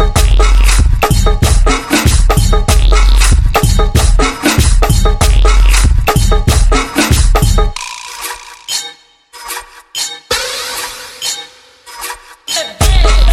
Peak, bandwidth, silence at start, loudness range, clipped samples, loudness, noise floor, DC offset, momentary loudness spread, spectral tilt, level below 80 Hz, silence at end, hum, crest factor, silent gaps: 0 dBFS; 16.5 kHz; 0 s; 9 LU; under 0.1%; -12 LUFS; -38 dBFS; under 0.1%; 13 LU; -4 dB/octave; -10 dBFS; 0 s; none; 10 dB; none